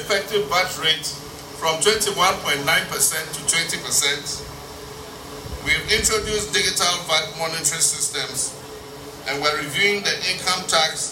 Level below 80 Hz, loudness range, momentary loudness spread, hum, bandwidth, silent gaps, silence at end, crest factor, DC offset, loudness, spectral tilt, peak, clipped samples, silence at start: -46 dBFS; 2 LU; 17 LU; none; 16.5 kHz; none; 0 s; 18 dB; under 0.1%; -20 LUFS; -1 dB/octave; -4 dBFS; under 0.1%; 0 s